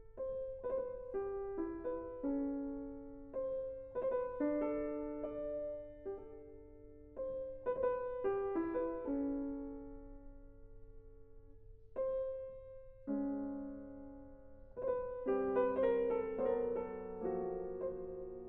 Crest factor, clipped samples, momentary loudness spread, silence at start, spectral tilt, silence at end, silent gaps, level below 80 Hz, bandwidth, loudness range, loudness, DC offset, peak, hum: 18 dB; under 0.1%; 17 LU; 0 s; -7.5 dB/octave; 0 s; none; -60 dBFS; 3.8 kHz; 7 LU; -40 LUFS; under 0.1%; -24 dBFS; none